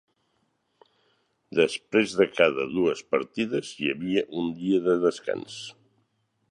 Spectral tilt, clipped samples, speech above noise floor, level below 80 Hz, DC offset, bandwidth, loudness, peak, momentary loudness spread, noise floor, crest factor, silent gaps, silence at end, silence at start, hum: -5 dB/octave; under 0.1%; 47 dB; -66 dBFS; under 0.1%; 11 kHz; -26 LUFS; -4 dBFS; 10 LU; -72 dBFS; 24 dB; none; 0.8 s; 1.5 s; none